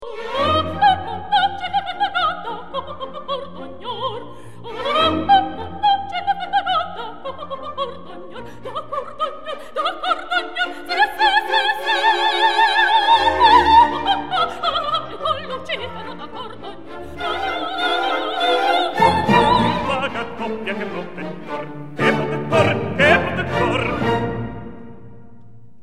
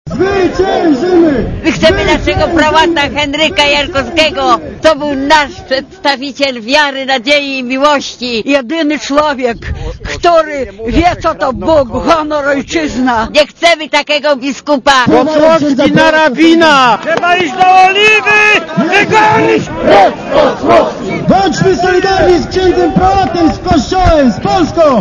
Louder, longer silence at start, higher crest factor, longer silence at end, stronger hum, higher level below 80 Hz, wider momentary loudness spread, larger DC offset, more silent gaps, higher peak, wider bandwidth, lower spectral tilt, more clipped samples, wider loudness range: second, -19 LUFS vs -9 LUFS; about the same, 0 s vs 0.05 s; first, 20 dB vs 10 dB; first, 0.25 s vs 0 s; neither; second, -46 dBFS vs -28 dBFS; first, 18 LU vs 7 LU; first, 2% vs under 0.1%; neither; about the same, 0 dBFS vs 0 dBFS; first, 14.5 kHz vs 11 kHz; about the same, -5 dB/octave vs -4.5 dB/octave; second, under 0.1% vs 1%; first, 10 LU vs 5 LU